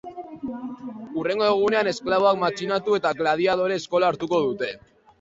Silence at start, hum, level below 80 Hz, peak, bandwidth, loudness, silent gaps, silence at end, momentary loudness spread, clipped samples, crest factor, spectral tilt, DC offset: 0.05 s; none; -62 dBFS; -6 dBFS; 7.8 kHz; -23 LUFS; none; 0.45 s; 14 LU; under 0.1%; 18 dB; -5 dB/octave; under 0.1%